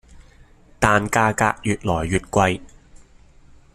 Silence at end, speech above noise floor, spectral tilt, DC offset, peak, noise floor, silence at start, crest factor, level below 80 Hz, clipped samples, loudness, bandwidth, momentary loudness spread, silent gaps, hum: 0.8 s; 30 dB; -5 dB/octave; under 0.1%; 0 dBFS; -49 dBFS; 0.15 s; 22 dB; -42 dBFS; under 0.1%; -20 LUFS; 14.5 kHz; 5 LU; none; none